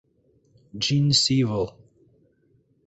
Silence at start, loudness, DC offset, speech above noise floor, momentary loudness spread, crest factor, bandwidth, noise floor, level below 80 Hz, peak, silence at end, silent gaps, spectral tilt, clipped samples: 0.75 s; -22 LUFS; under 0.1%; 42 dB; 13 LU; 18 dB; 8.2 kHz; -64 dBFS; -56 dBFS; -8 dBFS; 1.15 s; none; -4.5 dB/octave; under 0.1%